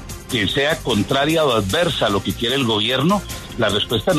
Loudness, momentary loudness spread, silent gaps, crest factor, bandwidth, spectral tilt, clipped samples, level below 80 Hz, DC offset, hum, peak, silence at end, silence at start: -18 LUFS; 4 LU; none; 12 dB; 13.5 kHz; -4.5 dB/octave; under 0.1%; -40 dBFS; under 0.1%; none; -6 dBFS; 0 s; 0 s